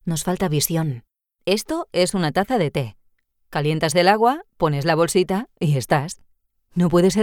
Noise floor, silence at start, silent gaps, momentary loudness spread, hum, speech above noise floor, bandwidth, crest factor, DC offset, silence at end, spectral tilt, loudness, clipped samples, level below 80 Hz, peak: -63 dBFS; 0.05 s; none; 12 LU; none; 43 dB; 18 kHz; 18 dB; under 0.1%; 0 s; -5 dB/octave; -21 LUFS; under 0.1%; -48 dBFS; -4 dBFS